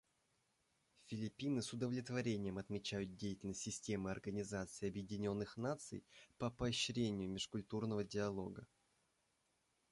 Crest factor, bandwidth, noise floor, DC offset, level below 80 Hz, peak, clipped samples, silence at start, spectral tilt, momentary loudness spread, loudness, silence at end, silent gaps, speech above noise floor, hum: 16 dB; 11.5 kHz; -83 dBFS; under 0.1%; -68 dBFS; -28 dBFS; under 0.1%; 1.05 s; -5 dB/octave; 7 LU; -44 LUFS; 1.25 s; none; 39 dB; none